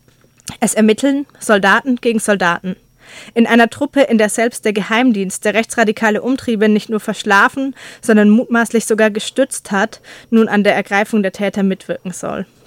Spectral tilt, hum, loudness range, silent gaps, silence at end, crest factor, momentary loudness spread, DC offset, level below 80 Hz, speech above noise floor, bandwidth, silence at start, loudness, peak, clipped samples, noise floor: -4.5 dB/octave; none; 2 LU; none; 0.2 s; 14 dB; 12 LU; under 0.1%; -56 dBFS; 21 dB; 16 kHz; 0.45 s; -14 LUFS; 0 dBFS; under 0.1%; -36 dBFS